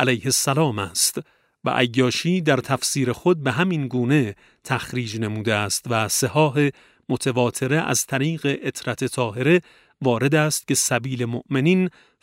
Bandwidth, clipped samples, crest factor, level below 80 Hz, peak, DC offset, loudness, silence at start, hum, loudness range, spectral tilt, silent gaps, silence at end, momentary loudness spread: 16 kHz; under 0.1%; 20 dB; -60 dBFS; -2 dBFS; under 0.1%; -21 LUFS; 0 s; none; 1 LU; -4.5 dB/octave; none; 0.35 s; 8 LU